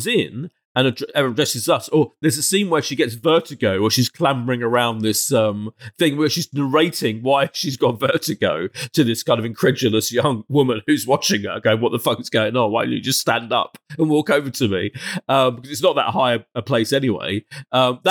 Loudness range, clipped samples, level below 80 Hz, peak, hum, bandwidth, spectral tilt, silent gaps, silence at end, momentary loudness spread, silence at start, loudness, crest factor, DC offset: 1 LU; under 0.1%; -66 dBFS; -4 dBFS; none; over 20 kHz; -4.5 dB/octave; 0.65-0.75 s; 0 s; 5 LU; 0 s; -19 LUFS; 14 dB; under 0.1%